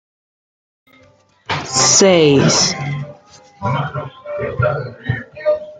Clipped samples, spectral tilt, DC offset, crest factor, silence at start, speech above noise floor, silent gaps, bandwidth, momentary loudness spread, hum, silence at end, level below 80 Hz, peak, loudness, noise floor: under 0.1%; -3.5 dB/octave; under 0.1%; 16 dB; 1.5 s; 37 dB; none; 10.5 kHz; 16 LU; none; 0 s; -50 dBFS; 0 dBFS; -15 LUFS; -51 dBFS